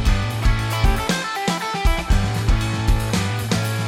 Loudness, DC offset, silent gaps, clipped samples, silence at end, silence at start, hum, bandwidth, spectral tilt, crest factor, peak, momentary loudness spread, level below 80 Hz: -21 LUFS; under 0.1%; none; under 0.1%; 0 s; 0 s; none; 16.5 kHz; -5 dB/octave; 14 dB; -4 dBFS; 2 LU; -22 dBFS